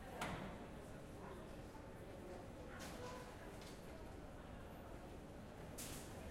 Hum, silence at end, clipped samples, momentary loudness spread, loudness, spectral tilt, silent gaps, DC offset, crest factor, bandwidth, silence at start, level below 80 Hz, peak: none; 0 s; under 0.1%; 5 LU; -53 LUFS; -4.5 dB/octave; none; under 0.1%; 20 dB; 16 kHz; 0 s; -60 dBFS; -32 dBFS